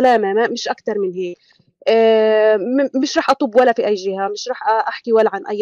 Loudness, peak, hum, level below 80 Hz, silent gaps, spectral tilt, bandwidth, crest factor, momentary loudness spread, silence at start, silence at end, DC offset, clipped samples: -16 LUFS; -2 dBFS; none; -66 dBFS; none; -4 dB/octave; 7.8 kHz; 14 dB; 10 LU; 0 s; 0 s; under 0.1%; under 0.1%